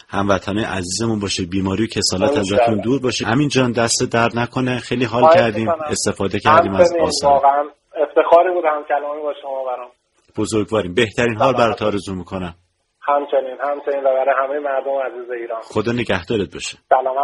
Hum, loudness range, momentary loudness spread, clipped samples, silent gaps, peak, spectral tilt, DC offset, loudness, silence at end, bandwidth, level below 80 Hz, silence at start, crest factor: none; 5 LU; 12 LU; under 0.1%; none; 0 dBFS; -4.5 dB/octave; under 0.1%; -18 LUFS; 0 s; 11.5 kHz; -48 dBFS; 0.1 s; 18 dB